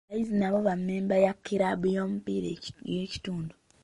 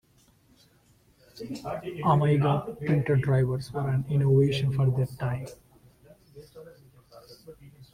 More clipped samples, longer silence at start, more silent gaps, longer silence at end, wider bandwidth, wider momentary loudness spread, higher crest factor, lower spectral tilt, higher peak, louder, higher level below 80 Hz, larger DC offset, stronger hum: neither; second, 0.1 s vs 1.35 s; neither; first, 0.35 s vs 0.1 s; about the same, 11 kHz vs 11.5 kHz; second, 11 LU vs 19 LU; about the same, 18 dB vs 18 dB; about the same, -7 dB/octave vs -8 dB/octave; about the same, -10 dBFS vs -10 dBFS; second, -29 LUFS vs -26 LUFS; about the same, -60 dBFS vs -56 dBFS; neither; neither